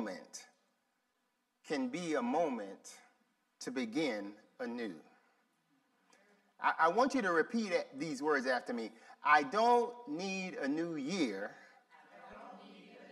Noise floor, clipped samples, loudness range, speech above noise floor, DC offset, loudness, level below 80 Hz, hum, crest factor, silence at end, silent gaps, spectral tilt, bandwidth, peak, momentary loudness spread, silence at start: -81 dBFS; under 0.1%; 10 LU; 47 dB; under 0.1%; -35 LUFS; -86 dBFS; none; 22 dB; 0 s; none; -4.5 dB/octave; 12.5 kHz; -16 dBFS; 23 LU; 0 s